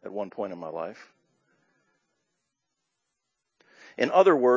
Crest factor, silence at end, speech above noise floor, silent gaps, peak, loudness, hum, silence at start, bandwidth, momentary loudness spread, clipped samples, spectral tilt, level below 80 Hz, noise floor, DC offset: 22 dB; 0 s; 58 dB; none; -6 dBFS; -26 LUFS; none; 0.05 s; 7.6 kHz; 18 LU; under 0.1%; -6 dB/octave; -84 dBFS; -82 dBFS; under 0.1%